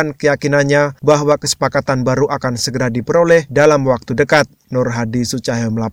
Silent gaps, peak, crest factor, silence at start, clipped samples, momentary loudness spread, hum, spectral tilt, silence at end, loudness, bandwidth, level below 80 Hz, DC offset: none; 0 dBFS; 14 dB; 0 s; under 0.1%; 7 LU; none; -5 dB/octave; 0 s; -15 LUFS; 17 kHz; -44 dBFS; under 0.1%